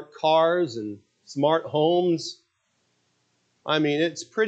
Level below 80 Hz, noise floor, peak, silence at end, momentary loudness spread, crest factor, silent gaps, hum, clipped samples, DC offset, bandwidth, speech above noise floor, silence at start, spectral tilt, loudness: -78 dBFS; -72 dBFS; -8 dBFS; 0 s; 16 LU; 16 dB; none; none; under 0.1%; under 0.1%; 8.6 kHz; 49 dB; 0 s; -5 dB/octave; -23 LUFS